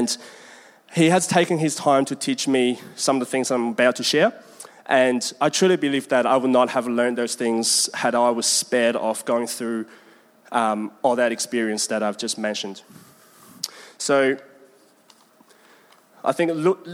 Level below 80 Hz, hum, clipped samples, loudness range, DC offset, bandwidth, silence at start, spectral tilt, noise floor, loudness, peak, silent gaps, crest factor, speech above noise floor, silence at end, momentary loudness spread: -76 dBFS; none; under 0.1%; 7 LU; under 0.1%; 16.5 kHz; 0 s; -3.5 dB/octave; -55 dBFS; -21 LUFS; -4 dBFS; none; 18 dB; 34 dB; 0 s; 11 LU